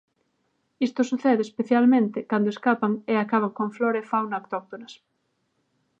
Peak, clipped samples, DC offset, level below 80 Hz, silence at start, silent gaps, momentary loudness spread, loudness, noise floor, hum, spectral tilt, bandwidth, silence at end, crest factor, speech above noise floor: -8 dBFS; under 0.1%; under 0.1%; -80 dBFS; 0.8 s; none; 11 LU; -24 LUFS; -73 dBFS; none; -6.5 dB/octave; 7.6 kHz; 1.05 s; 18 dB; 50 dB